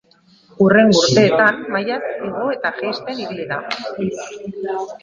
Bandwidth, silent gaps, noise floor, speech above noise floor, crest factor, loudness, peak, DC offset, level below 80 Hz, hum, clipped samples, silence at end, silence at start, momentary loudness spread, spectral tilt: 9 kHz; none; -52 dBFS; 35 dB; 18 dB; -17 LUFS; 0 dBFS; under 0.1%; -56 dBFS; none; under 0.1%; 0.05 s; 0.6 s; 14 LU; -4.5 dB/octave